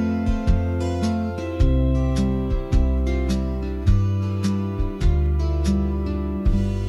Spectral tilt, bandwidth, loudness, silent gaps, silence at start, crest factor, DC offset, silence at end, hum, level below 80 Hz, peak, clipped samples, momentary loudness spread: -8 dB/octave; 11.5 kHz; -23 LUFS; none; 0 s; 12 dB; under 0.1%; 0 s; none; -24 dBFS; -8 dBFS; under 0.1%; 4 LU